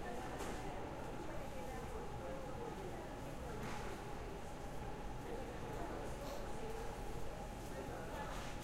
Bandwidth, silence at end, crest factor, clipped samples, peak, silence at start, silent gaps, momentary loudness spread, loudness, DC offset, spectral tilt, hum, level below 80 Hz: 16 kHz; 0 s; 14 dB; under 0.1%; -32 dBFS; 0 s; none; 3 LU; -48 LUFS; under 0.1%; -5.5 dB/octave; none; -52 dBFS